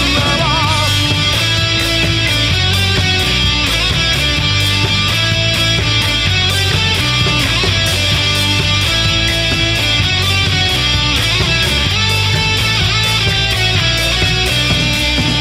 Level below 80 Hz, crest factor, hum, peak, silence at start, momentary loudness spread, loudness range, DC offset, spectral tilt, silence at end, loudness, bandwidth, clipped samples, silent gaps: -24 dBFS; 12 dB; none; 0 dBFS; 0 s; 1 LU; 0 LU; under 0.1%; -3.5 dB/octave; 0 s; -12 LUFS; 16 kHz; under 0.1%; none